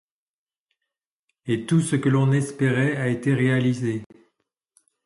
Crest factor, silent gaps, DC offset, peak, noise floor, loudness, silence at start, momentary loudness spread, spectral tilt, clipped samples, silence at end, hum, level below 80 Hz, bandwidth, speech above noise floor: 14 dB; none; under 0.1%; -10 dBFS; under -90 dBFS; -22 LUFS; 1.45 s; 8 LU; -7 dB/octave; under 0.1%; 1 s; none; -62 dBFS; 11.5 kHz; over 69 dB